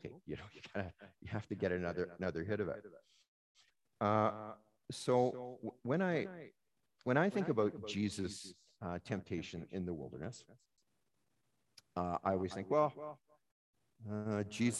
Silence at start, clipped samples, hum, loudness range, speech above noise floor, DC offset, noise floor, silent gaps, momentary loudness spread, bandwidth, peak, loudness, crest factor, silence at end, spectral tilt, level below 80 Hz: 0.05 s; under 0.1%; none; 7 LU; 46 dB; under 0.1%; -84 dBFS; 3.28-3.55 s, 13.52-13.73 s; 16 LU; 12.5 kHz; -16 dBFS; -39 LUFS; 24 dB; 0 s; -6 dB/octave; -64 dBFS